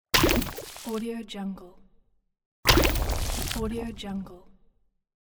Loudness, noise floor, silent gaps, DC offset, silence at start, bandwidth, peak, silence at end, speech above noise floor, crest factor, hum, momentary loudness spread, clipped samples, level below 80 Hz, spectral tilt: -27 LUFS; -65 dBFS; 2.46-2.63 s; under 0.1%; 0.15 s; over 20 kHz; -4 dBFS; 0.9 s; 32 dB; 26 dB; none; 16 LU; under 0.1%; -34 dBFS; -3.5 dB/octave